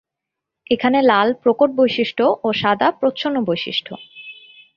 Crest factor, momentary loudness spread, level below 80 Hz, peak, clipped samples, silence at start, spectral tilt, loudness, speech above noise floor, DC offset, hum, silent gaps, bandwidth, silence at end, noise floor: 18 dB; 19 LU; -62 dBFS; -2 dBFS; under 0.1%; 0.7 s; -6.5 dB/octave; -17 LUFS; 65 dB; under 0.1%; none; none; 7 kHz; 0.45 s; -83 dBFS